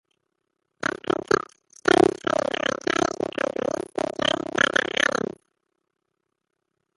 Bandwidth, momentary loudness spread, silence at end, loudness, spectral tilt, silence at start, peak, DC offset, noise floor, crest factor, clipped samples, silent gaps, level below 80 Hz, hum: 11.5 kHz; 9 LU; 1.8 s; -24 LUFS; -3.5 dB/octave; 0.8 s; -2 dBFS; under 0.1%; -80 dBFS; 24 dB; under 0.1%; none; -58 dBFS; none